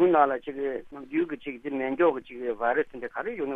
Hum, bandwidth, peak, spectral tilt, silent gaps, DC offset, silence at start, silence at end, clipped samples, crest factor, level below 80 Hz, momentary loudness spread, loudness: none; 3.9 kHz; -6 dBFS; -8 dB/octave; none; under 0.1%; 0 s; 0 s; under 0.1%; 20 dB; -62 dBFS; 10 LU; -28 LUFS